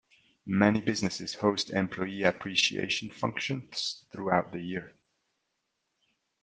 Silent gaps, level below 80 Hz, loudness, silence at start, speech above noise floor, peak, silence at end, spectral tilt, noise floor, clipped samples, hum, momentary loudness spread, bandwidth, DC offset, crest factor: none; -68 dBFS; -30 LUFS; 0.45 s; 51 dB; -6 dBFS; 1.55 s; -4.5 dB/octave; -81 dBFS; under 0.1%; none; 11 LU; 9.6 kHz; under 0.1%; 24 dB